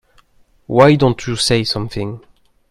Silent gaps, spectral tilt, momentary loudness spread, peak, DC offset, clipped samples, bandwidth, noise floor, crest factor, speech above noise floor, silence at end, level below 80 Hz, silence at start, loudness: none; -5.5 dB/octave; 15 LU; 0 dBFS; under 0.1%; under 0.1%; 13 kHz; -52 dBFS; 16 dB; 38 dB; 0.5 s; -42 dBFS; 0.7 s; -15 LUFS